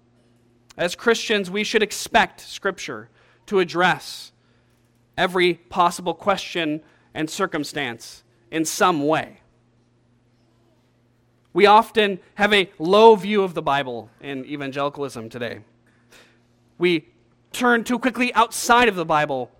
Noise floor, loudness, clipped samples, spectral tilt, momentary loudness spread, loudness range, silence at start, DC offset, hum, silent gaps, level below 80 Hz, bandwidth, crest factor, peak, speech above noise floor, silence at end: -61 dBFS; -20 LUFS; under 0.1%; -4 dB/octave; 17 LU; 8 LU; 0.75 s; under 0.1%; none; none; -56 dBFS; 17 kHz; 22 dB; 0 dBFS; 40 dB; 0.15 s